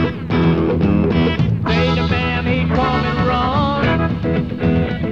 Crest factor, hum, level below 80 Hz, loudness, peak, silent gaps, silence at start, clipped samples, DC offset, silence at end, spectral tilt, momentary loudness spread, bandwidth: 14 dB; none; -30 dBFS; -17 LUFS; -2 dBFS; none; 0 s; under 0.1%; 0.6%; 0 s; -8 dB/octave; 3 LU; 6.8 kHz